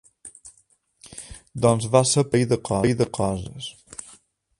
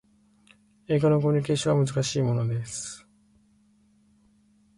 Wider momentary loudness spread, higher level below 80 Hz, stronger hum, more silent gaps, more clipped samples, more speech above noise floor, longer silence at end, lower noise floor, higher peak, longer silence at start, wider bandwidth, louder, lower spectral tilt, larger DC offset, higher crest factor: first, 22 LU vs 13 LU; first, -50 dBFS vs -60 dBFS; neither; neither; neither; about the same, 41 dB vs 38 dB; second, 0.9 s vs 1.8 s; about the same, -62 dBFS vs -62 dBFS; first, -2 dBFS vs -12 dBFS; second, 0.25 s vs 0.9 s; about the same, 11.5 kHz vs 11.5 kHz; first, -21 LUFS vs -25 LUFS; about the same, -5 dB/octave vs -6 dB/octave; neither; first, 22 dB vs 16 dB